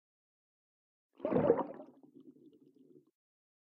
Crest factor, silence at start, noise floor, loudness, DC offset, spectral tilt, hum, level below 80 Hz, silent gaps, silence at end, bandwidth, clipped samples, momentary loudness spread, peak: 26 dB; 1.2 s; -64 dBFS; -34 LUFS; under 0.1%; -8 dB/octave; none; -70 dBFS; none; 1.4 s; 3.9 kHz; under 0.1%; 22 LU; -14 dBFS